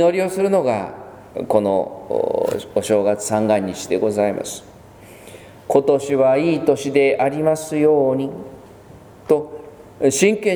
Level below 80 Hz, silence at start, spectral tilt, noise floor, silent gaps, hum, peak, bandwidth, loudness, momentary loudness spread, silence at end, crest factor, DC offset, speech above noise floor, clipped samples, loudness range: -56 dBFS; 0 s; -5 dB/octave; -42 dBFS; none; none; 0 dBFS; over 20 kHz; -18 LUFS; 16 LU; 0 s; 18 dB; under 0.1%; 25 dB; under 0.1%; 3 LU